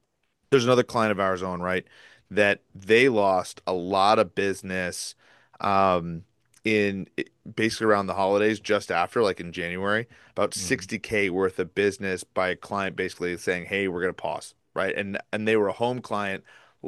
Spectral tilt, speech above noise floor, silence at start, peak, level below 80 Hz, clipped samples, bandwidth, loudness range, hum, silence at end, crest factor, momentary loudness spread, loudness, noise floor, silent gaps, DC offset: -4.5 dB/octave; 48 dB; 0.5 s; -4 dBFS; -62 dBFS; under 0.1%; 12.5 kHz; 4 LU; none; 0 s; 20 dB; 11 LU; -25 LUFS; -74 dBFS; none; under 0.1%